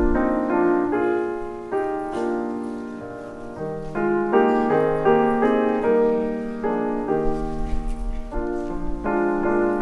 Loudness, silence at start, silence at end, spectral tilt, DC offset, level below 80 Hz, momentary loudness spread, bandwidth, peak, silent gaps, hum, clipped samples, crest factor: -23 LUFS; 0 s; 0 s; -8 dB/octave; under 0.1%; -34 dBFS; 13 LU; 11 kHz; -4 dBFS; none; none; under 0.1%; 18 dB